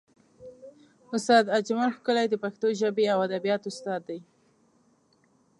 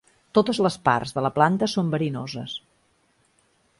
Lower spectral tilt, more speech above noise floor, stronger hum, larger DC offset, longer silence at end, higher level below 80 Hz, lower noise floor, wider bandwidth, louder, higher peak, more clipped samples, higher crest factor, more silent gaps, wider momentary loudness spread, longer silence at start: second, -4.5 dB/octave vs -6 dB/octave; about the same, 40 dB vs 43 dB; neither; neither; first, 1.4 s vs 1.2 s; second, -80 dBFS vs -60 dBFS; about the same, -66 dBFS vs -65 dBFS; about the same, 11.5 kHz vs 11.5 kHz; second, -26 LUFS vs -23 LUFS; second, -8 dBFS vs -4 dBFS; neither; about the same, 22 dB vs 22 dB; neither; first, 16 LU vs 12 LU; about the same, 0.4 s vs 0.35 s